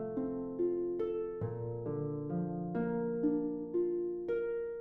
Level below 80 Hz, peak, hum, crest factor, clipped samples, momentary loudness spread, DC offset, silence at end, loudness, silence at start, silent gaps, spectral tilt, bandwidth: -62 dBFS; -22 dBFS; none; 14 dB; under 0.1%; 5 LU; under 0.1%; 0 s; -36 LUFS; 0 s; none; -10.5 dB/octave; 3.5 kHz